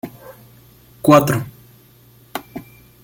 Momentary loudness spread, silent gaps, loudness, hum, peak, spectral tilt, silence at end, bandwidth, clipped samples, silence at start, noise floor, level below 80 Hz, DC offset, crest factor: 23 LU; none; -15 LUFS; none; 0 dBFS; -6 dB/octave; 0.45 s; 17 kHz; under 0.1%; 0.05 s; -49 dBFS; -52 dBFS; under 0.1%; 20 dB